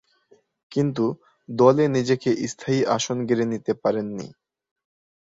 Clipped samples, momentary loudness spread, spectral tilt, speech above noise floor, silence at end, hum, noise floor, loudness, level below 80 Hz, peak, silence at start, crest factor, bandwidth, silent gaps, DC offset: under 0.1%; 15 LU; -6 dB/octave; 38 dB; 0.9 s; none; -60 dBFS; -23 LUFS; -64 dBFS; -4 dBFS; 0.7 s; 20 dB; 7.8 kHz; none; under 0.1%